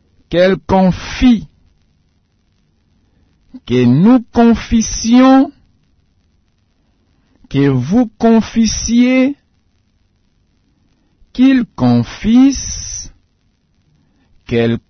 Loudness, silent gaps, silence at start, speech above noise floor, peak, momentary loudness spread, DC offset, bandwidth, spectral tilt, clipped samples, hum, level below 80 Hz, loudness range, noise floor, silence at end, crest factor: -12 LUFS; none; 0.3 s; 48 dB; -2 dBFS; 11 LU; under 0.1%; 6.6 kHz; -5.5 dB/octave; under 0.1%; none; -34 dBFS; 4 LU; -59 dBFS; 0.1 s; 14 dB